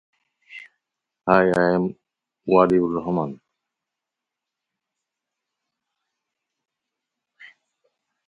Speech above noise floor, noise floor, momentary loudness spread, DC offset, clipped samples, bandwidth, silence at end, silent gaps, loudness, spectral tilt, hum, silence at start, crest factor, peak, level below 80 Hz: 66 dB; -85 dBFS; 24 LU; under 0.1%; under 0.1%; 10.5 kHz; 0.8 s; none; -20 LUFS; -8 dB/octave; none; 0.5 s; 26 dB; 0 dBFS; -60 dBFS